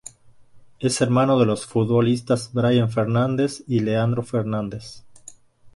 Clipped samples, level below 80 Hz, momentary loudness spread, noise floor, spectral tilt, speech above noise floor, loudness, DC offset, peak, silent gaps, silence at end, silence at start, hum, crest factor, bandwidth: under 0.1%; -54 dBFS; 11 LU; -48 dBFS; -6.5 dB/octave; 28 dB; -21 LUFS; under 0.1%; -6 dBFS; none; 0.05 s; 0.55 s; none; 16 dB; 11.5 kHz